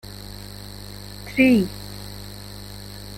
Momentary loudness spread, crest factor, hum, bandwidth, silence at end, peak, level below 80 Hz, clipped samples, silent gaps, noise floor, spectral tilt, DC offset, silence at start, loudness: 20 LU; 22 dB; 50 Hz at -35 dBFS; 16.5 kHz; 0 s; -4 dBFS; -44 dBFS; under 0.1%; none; -37 dBFS; -5.5 dB/octave; under 0.1%; 0.3 s; -19 LUFS